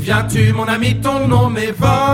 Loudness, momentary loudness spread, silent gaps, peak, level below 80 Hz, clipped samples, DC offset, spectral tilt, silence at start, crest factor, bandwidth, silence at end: -15 LUFS; 3 LU; none; 0 dBFS; -34 dBFS; under 0.1%; under 0.1%; -6 dB/octave; 0 s; 14 dB; 15.5 kHz; 0 s